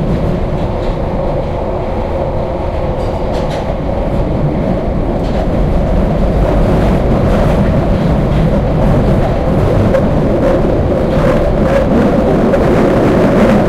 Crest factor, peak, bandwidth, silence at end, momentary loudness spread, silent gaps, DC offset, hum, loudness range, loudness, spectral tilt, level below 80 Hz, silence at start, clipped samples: 10 dB; -2 dBFS; 12.5 kHz; 0 s; 7 LU; none; under 0.1%; none; 5 LU; -13 LUFS; -8.5 dB/octave; -18 dBFS; 0 s; under 0.1%